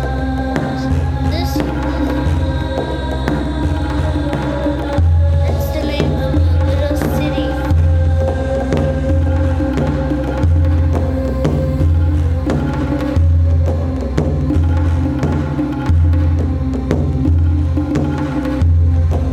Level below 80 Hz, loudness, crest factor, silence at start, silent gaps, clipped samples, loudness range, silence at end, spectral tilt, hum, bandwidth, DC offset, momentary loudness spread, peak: -20 dBFS; -16 LUFS; 14 dB; 0 s; none; under 0.1%; 2 LU; 0 s; -8 dB/octave; none; 13 kHz; under 0.1%; 5 LU; 0 dBFS